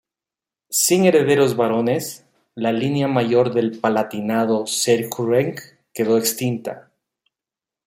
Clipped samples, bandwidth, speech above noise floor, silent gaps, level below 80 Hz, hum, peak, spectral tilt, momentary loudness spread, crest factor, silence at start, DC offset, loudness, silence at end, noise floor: under 0.1%; 16.5 kHz; 70 dB; none; -64 dBFS; none; -2 dBFS; -4.5 dB/octave; 13 LU; 18 dB; 0.7 s; under 0.1%; -19 LUFS; 1.05 s; -89 dBFS